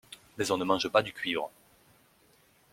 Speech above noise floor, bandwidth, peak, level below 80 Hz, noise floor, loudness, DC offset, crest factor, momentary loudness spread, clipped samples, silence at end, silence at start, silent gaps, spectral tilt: 35 dB; 16.5 kHz; -8 dBFS; -68 dBFS; -64 dBFS; -30 LUFS; under 0.1%; 24 dB; 13 LU; under 0.1%; 1.25 s; 0.1 s; none; -3.5 dB/octave